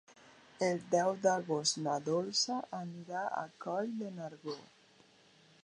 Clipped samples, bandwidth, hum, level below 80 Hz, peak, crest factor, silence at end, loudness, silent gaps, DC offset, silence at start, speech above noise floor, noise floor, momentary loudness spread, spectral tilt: under 0.1%; 10 kHz; none; -84 dBFS; -16 dBFS; 20 dB; 1 s; -35 LUFS; none; under 0.1%; 0.1 s; 29 dB; -64 dBFS; 12 LU; -3.5 dB/octave